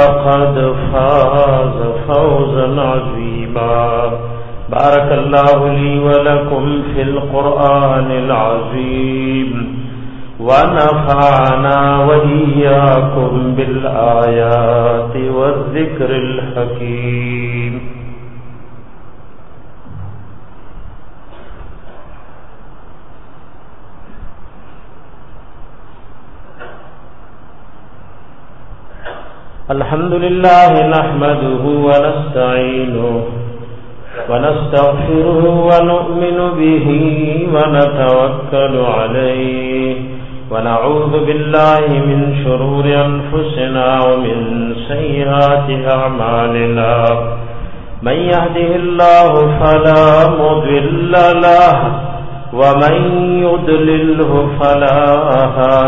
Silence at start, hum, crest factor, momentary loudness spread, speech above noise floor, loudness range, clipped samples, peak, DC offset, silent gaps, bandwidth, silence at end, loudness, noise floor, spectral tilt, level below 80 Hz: 0 s; none; 12 dB; 12 LU; 27 dB; 5 LU; under 0.1%; 0 dBFS; 5%; none; 6.6 kHz; 0 s; -12 LUFS; -38 dBFS; -9 dB/octave; -32 dBFS